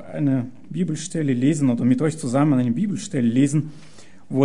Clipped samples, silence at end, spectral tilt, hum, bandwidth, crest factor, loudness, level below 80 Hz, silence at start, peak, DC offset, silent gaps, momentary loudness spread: under 0.1%; 0 s; -7 dB/octave; none; 11 kHz; 16 dB; -21 LUFS; -62 dBFS; 0 s; -6 dBFS; 1%; none; 7 LU